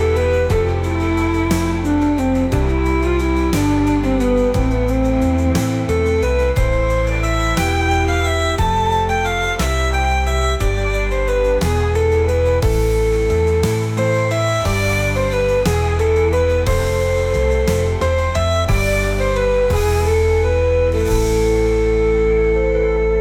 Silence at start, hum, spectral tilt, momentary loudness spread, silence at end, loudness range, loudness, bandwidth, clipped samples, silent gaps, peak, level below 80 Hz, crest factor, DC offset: 0 s; none; -6 dB/octave; 2 LU; 0 s; 1 LU; -17 LUFS; 17 kHz; under 0.1%; none; -4 dBFS; -22 dBFS; 12 dB; under 0.1%